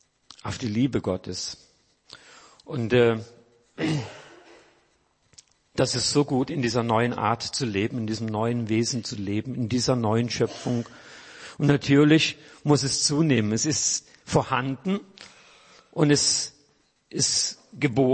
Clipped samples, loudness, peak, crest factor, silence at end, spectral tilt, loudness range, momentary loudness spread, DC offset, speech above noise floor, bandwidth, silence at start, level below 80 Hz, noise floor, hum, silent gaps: under 0.1%; -24 LUFS; -8 dBFS; 18 dB; 0 s; -4.5 dB/octave; 6 LU; 13 LU; under 0.1%; 43 dB; 8.8 kHz; 0.45 s; -58 dBFS; -67 dBFS; none; none